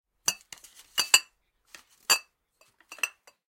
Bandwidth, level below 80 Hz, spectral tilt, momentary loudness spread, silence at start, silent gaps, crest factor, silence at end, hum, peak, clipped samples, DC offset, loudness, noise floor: 17 kHz; -76 dBFS; 2.5 dB/octave; 19 LU; 0.25 s; none; 32 dB; 0.4 s; none; 0 dBFS; under 0.1%; under 0.1%; -26 LUFS; -67 dBFS